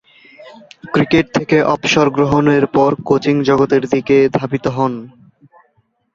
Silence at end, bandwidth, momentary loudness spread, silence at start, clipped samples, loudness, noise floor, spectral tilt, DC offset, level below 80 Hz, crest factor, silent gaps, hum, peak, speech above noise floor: 1.05 s; 7.4 kHz; 6 LU; 0.4 s; under 0.1%; -14 LUFS; -61 dBFS; -6 dB/octave; under 0.1%; -46 dBFS; 14 dB; none; none; 0 dBFS; 47 dB